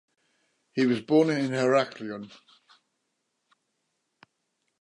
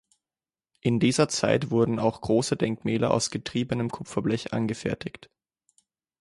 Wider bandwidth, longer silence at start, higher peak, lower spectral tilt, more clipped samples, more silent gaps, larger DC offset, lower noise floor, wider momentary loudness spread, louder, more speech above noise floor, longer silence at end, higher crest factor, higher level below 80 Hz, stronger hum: about the same, 11 kHz vs 11.5 kHz; about the same, 0.75 s vs 0.85 s; second, -10 dBFS vs -6 dBFS; about the same, -6 dB/octave vs -5.5 dB/octave; neither; neither; neither; second, -79 dBFS vs under -90 dBFS; first, 16 LU vs 8 LU; about the same, -26 LUFS vs -26 LUFS; second, 53 dB vs over 64 dB; first, 2.55 s vs 1.1 s; about the same, 20 dB vs 20 dB; second, -78 dBFS vs -56 dBFS; neither